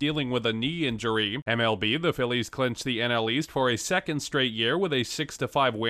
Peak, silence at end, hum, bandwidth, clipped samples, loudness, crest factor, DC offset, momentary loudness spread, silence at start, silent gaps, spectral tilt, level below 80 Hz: -10 dBFS; 0 s; none; 14.5 kHz; under 0.1%; -26 LUFS; 16 dB; under 0.1%; 4 LU; 0 s; 1.42-1.46 s; -4.5 dB/octave; -56 dBFS